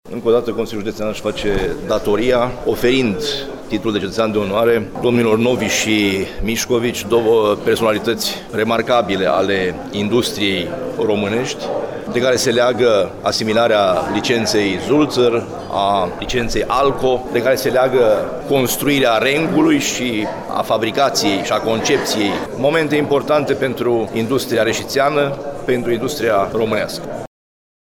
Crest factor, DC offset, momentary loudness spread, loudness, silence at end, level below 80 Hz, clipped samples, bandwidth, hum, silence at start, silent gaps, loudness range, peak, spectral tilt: 12 dB; under 0.1%; 7 LU; -17 LUFS; 0.75 s; -38 dBFS; under 0.1%; 18 kHz; none; 0.05 s; none; 3 LU; -4 dBFS; -4.5 dB/octave